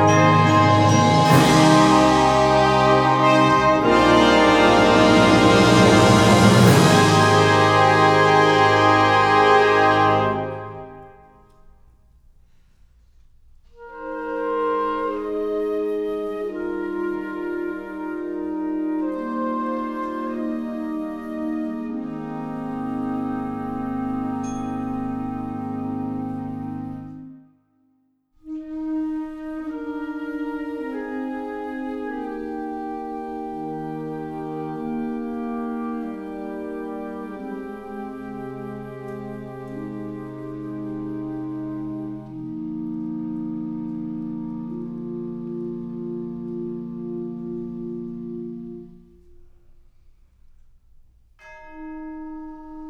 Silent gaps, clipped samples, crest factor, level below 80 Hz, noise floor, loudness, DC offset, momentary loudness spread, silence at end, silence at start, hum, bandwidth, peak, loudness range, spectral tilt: none; under 0.1%; 20 dB; -46 dBFS; -65 dBFS; -20 LUFS; under 0.1%; 19 LU; 0 s; 0 s; none; 18 kHz; -2 dBFS; 18 LU; -5.5 dB/octave